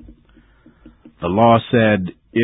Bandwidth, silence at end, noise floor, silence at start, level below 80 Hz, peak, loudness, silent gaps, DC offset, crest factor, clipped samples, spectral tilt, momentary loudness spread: 4 kHz; 0 s; -51 dBFS; 1.2 s; -44 dBFS; 0 dBFS; -16 LUFS; none; under 0.1%; 18 dB; under 0.1%; -10.5 dB/octave; 10 LU